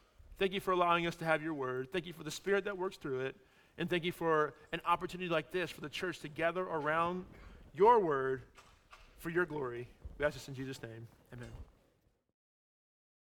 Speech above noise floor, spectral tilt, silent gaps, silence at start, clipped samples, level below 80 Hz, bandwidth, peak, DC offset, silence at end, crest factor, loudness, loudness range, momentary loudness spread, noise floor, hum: 39 dB; -5.5 dB/octave; none; 0.3 s; under 0.1%; -62 dBFS; 18.5 kHz; -14 dBFS; under 0.1%; 1.6 s; 22 dB; -35 LUFS; 7 LU; 18 LU; -74 dBFS; none